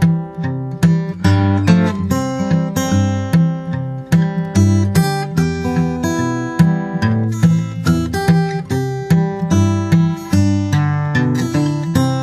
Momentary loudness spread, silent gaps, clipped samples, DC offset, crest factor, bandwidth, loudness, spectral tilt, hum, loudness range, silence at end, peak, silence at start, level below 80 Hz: 5 LU; none; under 0.1%; under 0.1%; 14 dB; 14 kHz; -16 LUFS; -7 dB/octave; none; 1 LU; 0 s; 0 dBFS; 0 s; -40 dBFS